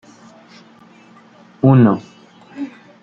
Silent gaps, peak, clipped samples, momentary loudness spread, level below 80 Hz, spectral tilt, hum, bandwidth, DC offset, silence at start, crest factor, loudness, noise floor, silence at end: none; -2 dBFS; under 0.1%; 20 LU; -58 dBFS; -10 dB/octave; none; 6.8 kHz; under 0.1%; 1.65 s; 16 dB; -14 LUFS; -46 dBFS; 0.35 s